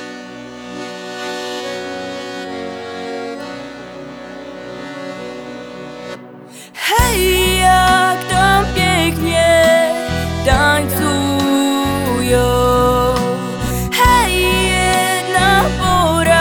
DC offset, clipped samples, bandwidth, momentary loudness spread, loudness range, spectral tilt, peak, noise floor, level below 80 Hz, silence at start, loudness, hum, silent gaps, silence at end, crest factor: under 0.1%; under 0.1%; over 20 kHz; 19 LU; 15 LU; -4 dB/octave; 0 dBFS; -36 dBFS; -28 dBFS; 0 s; -14 LUFS; none; none; 0 s; 16 dB